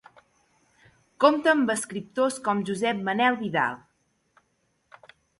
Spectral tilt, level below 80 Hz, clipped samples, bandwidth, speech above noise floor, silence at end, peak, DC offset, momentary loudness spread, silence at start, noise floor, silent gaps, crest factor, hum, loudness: -4 dB/octave; -70 dBFS; under 0.1%; 12 kHz; 48 dB; 1.65 s; -4 dBFS; under 0.1%; 8 LU; 1.2 s; -72 dBFS; none; 22 dB; none; -24 LUFS